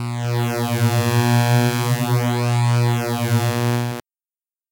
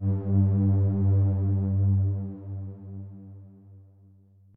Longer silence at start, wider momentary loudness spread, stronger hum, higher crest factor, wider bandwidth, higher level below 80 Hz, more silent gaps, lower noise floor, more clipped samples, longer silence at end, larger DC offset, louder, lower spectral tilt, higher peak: about the same, 0 s vs 0 s; second, 5 LU vs 18 LU; neither; about the same, 16 dB vs 12 dB; first, 17 kHz vs 1.6 kHz; about the same, -60 dBFS vs -60 dBFS; neither; first, under -90 dBFS vs -56 dBFS; neither; about the same, 0.7 s vs 0.75 s; neither; first, -19 LUFS vs -25 LUFS; second, -5.5 dB/octave vs -14.5 dB/octave; first, -4 dBFS vs -14 dBFS